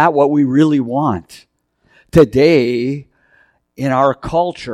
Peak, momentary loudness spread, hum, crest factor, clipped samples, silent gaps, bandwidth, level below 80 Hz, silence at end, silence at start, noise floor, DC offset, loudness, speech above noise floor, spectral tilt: 0 dBFS; 11 LU; none; 14 dB; under 0.1%; none; 14 kHz; -42 dBFS; 0 s; 0 s; -56 dBFS; under 0.1%; -14 LUFS; 43 dB; -7.5 dB/octave